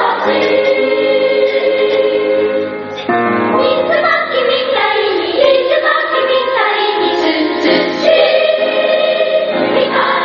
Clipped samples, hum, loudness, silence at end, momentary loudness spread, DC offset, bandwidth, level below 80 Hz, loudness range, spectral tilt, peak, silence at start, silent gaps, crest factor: under 0.1%; none; -12 LUFS; 0 s; 3 LU; under 0.1%; 6.4 kHz; -58 dBFS; 1 LU; -1 dB/octave; 0 dBFS; 0 s; none; 12 dB